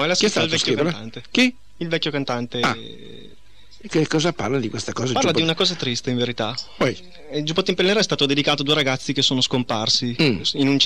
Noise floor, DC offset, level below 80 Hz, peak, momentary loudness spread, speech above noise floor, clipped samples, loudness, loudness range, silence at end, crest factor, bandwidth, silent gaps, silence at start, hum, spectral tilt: -51 dBFS; 1%; -54 dBFS; -2 dBFS; 8 LU; 30 dB; under 0.1%; -20 LUFS; 5 LU; 0 s; 18 dB; 13.5 kHz; none; 0 s; none; -4 dB/octave